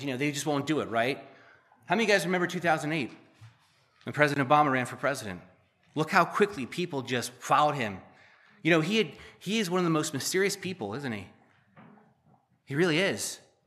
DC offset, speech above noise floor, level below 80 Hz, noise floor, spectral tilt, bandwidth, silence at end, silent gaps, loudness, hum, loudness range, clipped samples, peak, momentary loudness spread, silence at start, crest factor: under 0.1%; 37 dB; -74 dBFS; -65 dBFS; -4.5 dB/octave; 15 kHz; 0.3 s; none; -28 LUFS; none; 4 LU; under 0.1%; -6 dBFS; 12 LU; 0 s; 24 dB